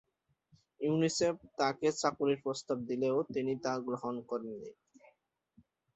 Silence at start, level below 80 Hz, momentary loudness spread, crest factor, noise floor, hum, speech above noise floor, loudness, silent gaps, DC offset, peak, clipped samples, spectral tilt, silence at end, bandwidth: 0.8 s; -74 dBFS; 9 LU; 20 dB; -74 dBFS; none; 40 dB; -34 LUFS; none; under 0.1%; -16 dBFS; under 0.1%; -5 dB/octave; 1.25 s; 8.4 kHz